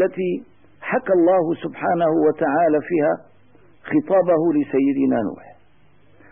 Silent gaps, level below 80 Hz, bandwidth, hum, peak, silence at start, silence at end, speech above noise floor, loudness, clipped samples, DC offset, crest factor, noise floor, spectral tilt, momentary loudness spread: none; -64 dBFS; 3.6 kHz; none; -8 dBFS; 0 s; 0.95 s; 38 dB; -20 LUFS; under 0.1%; 0.3%; 12 dB; -57 dBFS; -12 dB/octave; 9 LU